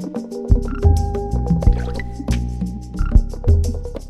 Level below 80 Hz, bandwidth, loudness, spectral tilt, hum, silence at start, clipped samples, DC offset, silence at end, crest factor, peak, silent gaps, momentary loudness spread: -20 dBFS; 12 kHz; -20 LUFS; -8 dB/octave; none; 0 s; under 0.1%; under 0.1%; 0 s; 18 dB; 0 dBFS; none; 10 LU